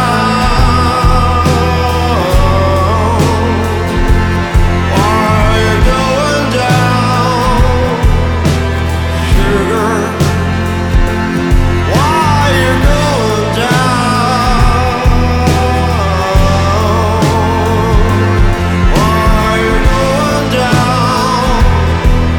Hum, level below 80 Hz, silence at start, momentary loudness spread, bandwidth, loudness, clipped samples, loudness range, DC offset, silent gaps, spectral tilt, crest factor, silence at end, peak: none; -16 dBFS; 0 s; 3 LU; 18 kHz; -11 LUFS; under 0.1%; 1 LU; under 0.1%; none; -6 dB/octave; 10 dB; 0 s; 0 dBFS